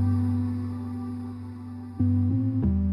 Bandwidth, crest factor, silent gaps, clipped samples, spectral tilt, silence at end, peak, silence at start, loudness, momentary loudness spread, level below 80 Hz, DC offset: 5.2 kHz; 12 dB; none; under 0.1%; -11 dB/octave; 0 s; -14 dBFS; 0 s; -27 LUFS; 14 LU; -40 dBFS; under 0.1%